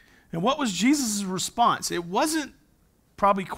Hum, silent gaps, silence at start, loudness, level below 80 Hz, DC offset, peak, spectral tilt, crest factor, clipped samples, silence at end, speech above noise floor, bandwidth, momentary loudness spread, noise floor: none; none; 0.35 s; -25 LUFS; -58 dBFS; under 0.1%; -8 dBFS; -3.5 dB/octave; 16 dB; under 0.1%; 0 s; 38 dB; 16 kHz; 7 LU; -63 dBFS